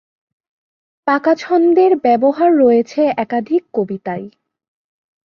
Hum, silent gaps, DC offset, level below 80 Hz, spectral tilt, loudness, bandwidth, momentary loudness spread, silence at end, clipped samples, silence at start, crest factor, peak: none; none; under 0.1%; -64 dBFS; -7 dB/octave; -15 LUFS; 7 kHz; 12 LU; 0.95 s; under 0.1%; 1.05 s; 14 dB; -2 dBFS